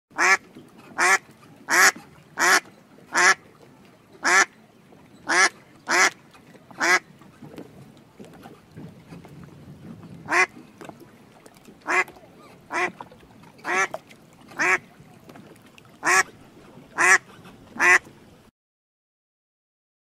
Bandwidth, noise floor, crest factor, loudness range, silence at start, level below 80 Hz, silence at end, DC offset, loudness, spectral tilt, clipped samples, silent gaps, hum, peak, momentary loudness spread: 16 kHz; -52 dBFS; 24 dB; 9 LU; 0.15 s; -68 dBFS; 2.05 s; under 0.1%; -20 LUFS; -1 dB/octave; under 0.1%; none; none; -2 dBFS; 26 LU